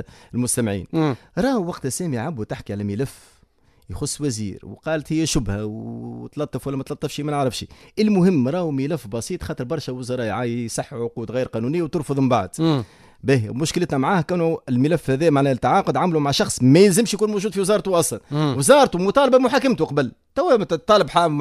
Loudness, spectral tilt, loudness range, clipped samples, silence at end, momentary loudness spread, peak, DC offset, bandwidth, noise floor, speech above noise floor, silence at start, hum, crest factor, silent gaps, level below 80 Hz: -21 LUFS; -5.5 dB/octave; 9 LU; under 0.1%; 0 s; 13 LU; 0 dBFS; under 0.1%; 14.5 kHz; -57 dBFS; 37 dB; 0 s; none; 20 dB; none; -46 dBFS